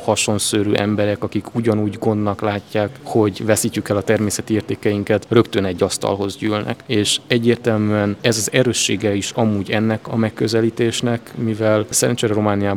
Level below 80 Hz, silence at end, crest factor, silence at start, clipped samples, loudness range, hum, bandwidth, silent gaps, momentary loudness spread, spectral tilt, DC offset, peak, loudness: -56 dBFS; 0 s; 18 dB; 0 s; under 0.1%; 2 LU; none; 17.5 kHz; none; 5 LU; -4.5 dB/octave; under 0.1%; 0 dBFS; -18 LUFS